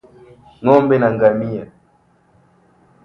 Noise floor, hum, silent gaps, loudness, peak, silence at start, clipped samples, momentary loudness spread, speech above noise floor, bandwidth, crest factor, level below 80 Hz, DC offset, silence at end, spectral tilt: -56 dBFS; none; none; -15 LUFS; 0 dBFS; 0.6 s; under 0.1%; 13 LU; 42 dB; 6 kHz; 18 dB; -54 dBFS; under 0.1%; 1.4 s; -9.5 dB/octave